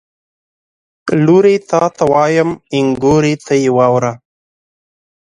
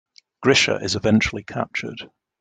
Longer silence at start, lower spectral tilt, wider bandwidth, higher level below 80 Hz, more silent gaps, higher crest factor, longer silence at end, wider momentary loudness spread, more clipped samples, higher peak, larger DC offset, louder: first, 1.05 s vs 0.4 s; first, -6.5 dB/octave vs -4 dB/octave; first, 10.5 kHz vs 9.4 kHz; about the same, -48 dBFS vs -48 dBFS; neither; second, 14 dB vs 20 dB; first, 1.05 s vs 0.35 s; second, 7 LU vs 13 LU; neither; about the same, 0 dBFS vs -2 dBFS; neither; first, -12 LUFS vs -20 LUFS